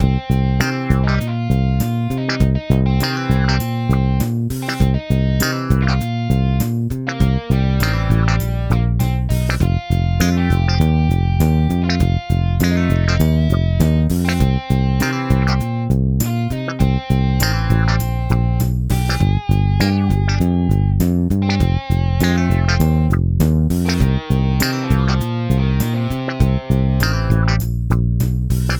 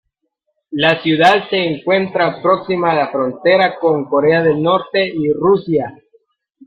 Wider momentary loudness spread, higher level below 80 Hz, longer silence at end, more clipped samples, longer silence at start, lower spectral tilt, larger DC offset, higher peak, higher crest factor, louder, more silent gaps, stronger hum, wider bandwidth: second, 3 LU vs 6 LU; first, -24 dBFS vs -56 dBFS; second, 0 s vs 0.75 s; neither; second, 0 s vs 0.7 s; about the same, -6.5 dB/octave vs -6.5 dB/octave; neither; about the same, 0 dBFS vs 0 dBFS; about the same, 16 dB vs 16 dB; about the same, -17 LUFS vs -15 LUFS; neither; neither; first, over 20 kHz vs 9.6 kHz